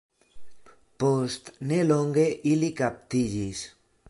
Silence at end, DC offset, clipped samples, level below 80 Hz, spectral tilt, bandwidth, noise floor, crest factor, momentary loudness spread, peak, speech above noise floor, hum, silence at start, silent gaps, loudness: 0.4 s; under 0.1%; under 0.1%; -58 dBFS; -6 dB/octave; 11.5 kHz; -49 dBFS; 16 dB; 11 LU; -10 dBFS; 24 dB; none; 0.35 s; none; -26 LUFS